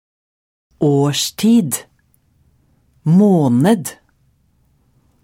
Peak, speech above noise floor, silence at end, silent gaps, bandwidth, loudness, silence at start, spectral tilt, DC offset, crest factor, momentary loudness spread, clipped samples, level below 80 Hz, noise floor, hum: -2 dBFS; 45 dB; 1.3 s; none; 16.5 kHz; -15 LUFS; 0.8 s; -6 dB/octave; under 0.1%; 14 dB; 12 LU; under 0.1%; -60 dBFS; -58 dBFS; none